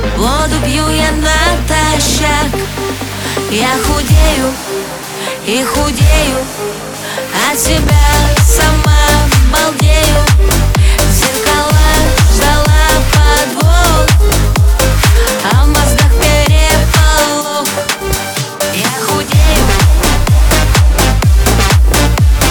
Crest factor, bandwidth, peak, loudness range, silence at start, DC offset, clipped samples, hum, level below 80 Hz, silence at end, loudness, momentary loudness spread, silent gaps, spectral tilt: 10 dB; over 20 kHz; 0 dBFS; 4 LU; 0 s; under 0.1%; under 0.1%; none; -12 dBFS; 0 s; -10 LUFS; 7 LU; none; -4 dB/octave